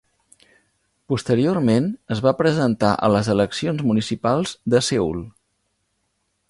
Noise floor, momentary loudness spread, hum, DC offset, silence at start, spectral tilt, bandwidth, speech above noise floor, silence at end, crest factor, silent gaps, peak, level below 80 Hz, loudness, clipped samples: -71 dBFS; 7 LU; none; under 0.1%; 1.1 s; -6 dB/octave; 11.5 kHz; 52 dB; 1.2 s; 18 dB; none; -4 dBFS; -50 dBFS; -20 LUFS; under 0.1%